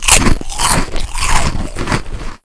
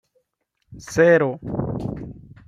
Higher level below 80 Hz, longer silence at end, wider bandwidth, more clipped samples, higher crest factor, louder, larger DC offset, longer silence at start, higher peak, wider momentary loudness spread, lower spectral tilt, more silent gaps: first, -18 dBFS vs -48 dBFS; second, 0.1 s vs 0.3 s; about the same, 11 kHz vs 12 kHz; first, 0.4% vs under 0.1%; second, 12 dB vs 20 dB; first, -15 LUFS vs -20 LUFS; neither; second, 0 s vs 0.7 s; first, 0 dBFS vs -4 dBFS; second, 12 LU vs 21 LU; second, -2.5 dB/octave vs -6.5 dB/octave; neither